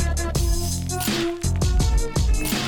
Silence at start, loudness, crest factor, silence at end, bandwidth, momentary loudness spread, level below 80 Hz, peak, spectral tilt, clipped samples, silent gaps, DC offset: 0 s; -23 LUFS; 10 dB; 0 s; 19 kHz; 3 LU; -24 dBFS; -12 dBFS; -4.5 dB/octave; under 0.1%; none; under 0.1%